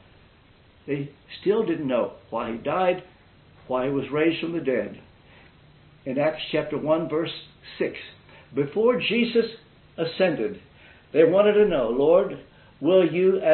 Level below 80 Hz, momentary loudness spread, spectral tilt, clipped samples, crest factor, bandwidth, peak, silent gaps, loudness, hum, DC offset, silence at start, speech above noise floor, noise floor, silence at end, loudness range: -58 dBFS; 14 LU; -10.5 dB/octave; under 0.1%; 18 dB; 4.4 kHz; -6 dBFS; none; -24 LUFS; none; under 0.1%; 0.85 s; 32 dB; -55 dBFS; 0 s; 7 LU